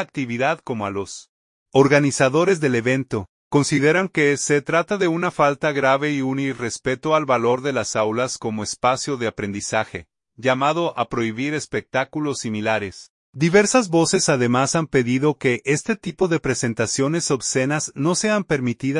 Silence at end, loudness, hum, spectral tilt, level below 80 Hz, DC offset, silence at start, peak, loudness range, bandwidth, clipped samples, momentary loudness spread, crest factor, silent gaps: 0 s; -20 LUFS; none; -4.5 dB/octave; -56 dBFS; under 0.1%; 0 s; -2 dBFS; 4 LU; 11 kHz; under 0.1%; 8 LU; 18 dB; 1.29-1.66 s, 3.29-3.51 s, 13.10-13.33 s